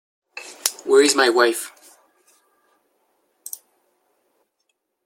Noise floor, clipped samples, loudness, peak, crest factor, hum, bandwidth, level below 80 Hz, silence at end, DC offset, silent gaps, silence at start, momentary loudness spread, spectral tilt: -74 dBFS; under 0.1%; -18 LUFS; 0 dBFS; 24 dB; none; 16.5 kHz; -76 dBFS; 3.35 s; under 0.1%; none; 0.35 s; 22 LU; -0.5 dB/octave